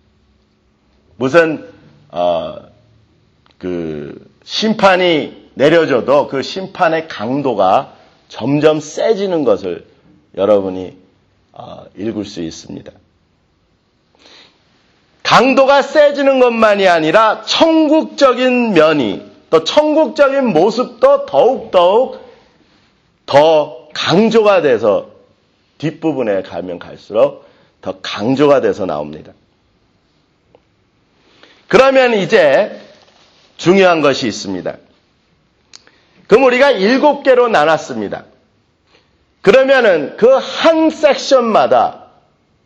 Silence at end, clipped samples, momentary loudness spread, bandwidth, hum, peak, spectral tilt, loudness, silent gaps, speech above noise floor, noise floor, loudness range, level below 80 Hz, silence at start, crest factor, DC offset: 0.7 s; under 0.1%; 15 LU; 8.4 kHz; none; 0 dBFS; -5 dB/octave; -12 LUFS; none; 46 dB; -58 dBFS; 9 LU; -54 dBFS; 1.2 s; 14 dB; under 0.1%